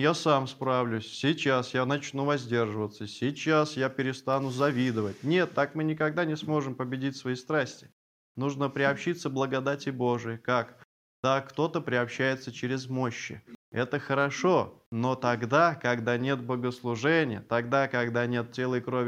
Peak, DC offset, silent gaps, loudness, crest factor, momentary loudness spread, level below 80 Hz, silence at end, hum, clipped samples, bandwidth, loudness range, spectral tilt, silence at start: -10 dBFS; under 0.1%; 7.92-8.35 s, 10.85-11.23 s, 13.55-13.72 s, 14.86-14.92 s; -29 LUFS; 20 dB; 7 LU; -74 dBFS; 0 s; none; under 0.1%; 15 kHz; 4 LU; -6 dB/octave; 0 s